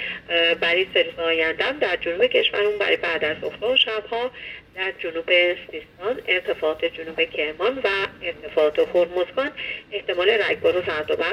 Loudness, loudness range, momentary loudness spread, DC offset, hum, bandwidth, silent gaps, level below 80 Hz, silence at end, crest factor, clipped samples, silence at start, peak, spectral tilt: -22 LUFS; 3 LU; 10 LU; under 0.1%; none; 11.5 kHz; none; -56 dBFS; 0 s; 18 dB; under 0.1%; 0 s; -4 dBFS; -4.5 dB/octave